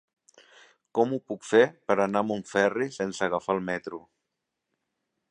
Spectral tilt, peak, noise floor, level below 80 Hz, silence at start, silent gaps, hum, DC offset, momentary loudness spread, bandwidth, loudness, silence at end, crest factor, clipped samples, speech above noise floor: -5 dB/octave; -6 dBFS; -83 dBFS; -70 dBFS; 0.95 s; none; none; under 0.1%; 11 LU; 10 kHz; -27 LUFS; 1.3 s; 22 dB; under 0.1%; 57 dB